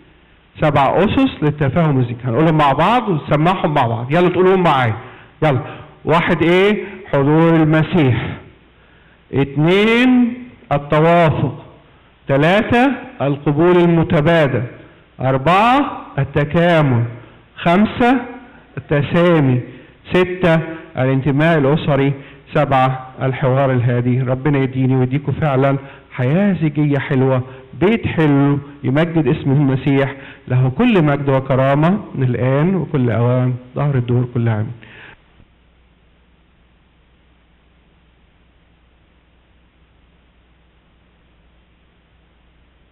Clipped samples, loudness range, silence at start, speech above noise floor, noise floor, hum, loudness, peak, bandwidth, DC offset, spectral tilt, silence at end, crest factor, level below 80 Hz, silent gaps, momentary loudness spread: under 0.1%; 2 LU; 0.55 s; 39 dB; -53 dBFS; none; -15 LUFS; -8 dBFS; 8.4 kHz; under 0.1%; -8.5 dB/octave; 7.85 s; 8 dB; -44 dBFS; none; 9 LU